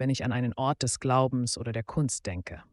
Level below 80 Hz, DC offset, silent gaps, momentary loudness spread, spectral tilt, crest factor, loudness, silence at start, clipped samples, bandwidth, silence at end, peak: -54 dBFS; under 0.1%; none; 8 LU; -5 dB/octave; 18 dB; -29 LUFS; 0 s; under 0.1%; 11.5 kHz; 0.1 s; -10 dBFS